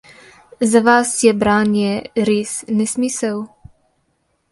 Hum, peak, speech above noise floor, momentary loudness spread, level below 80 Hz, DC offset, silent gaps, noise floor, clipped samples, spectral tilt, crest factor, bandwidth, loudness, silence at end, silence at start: none; 0 dBFS; 50 dB; 9 LU; -52 dBFS; under 0.1%; none; -66 dBFS; under 0.1%; -4.5 dB/octave; 18 dB; 11.5 kHz; -16 LUFS; 1.05 s; 0.6 s